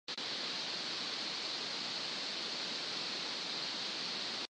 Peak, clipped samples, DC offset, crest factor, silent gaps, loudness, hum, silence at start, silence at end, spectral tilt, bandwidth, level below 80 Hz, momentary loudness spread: -26 dBFS; under 0.1%; under 0.1%; 14 dB; none; -37 LUFS; none; 0.1 s; 0.05 s; -1 dB/octave; 10 kHz; -88 dBFS; 0 LU